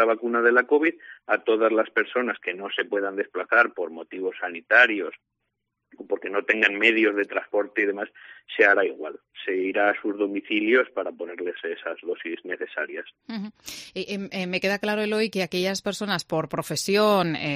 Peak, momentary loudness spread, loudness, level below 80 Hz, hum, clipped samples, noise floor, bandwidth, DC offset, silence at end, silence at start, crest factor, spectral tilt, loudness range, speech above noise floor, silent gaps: -4 dBFS; 14 LU; -24 LUFS; -70 dBFS; none; under 0.1%; -79 dBFS; 14 kHz; under 0.1%; 0 s; 0 s; 22 dB; -4 dB/octave; 6 LU; 55 dB; none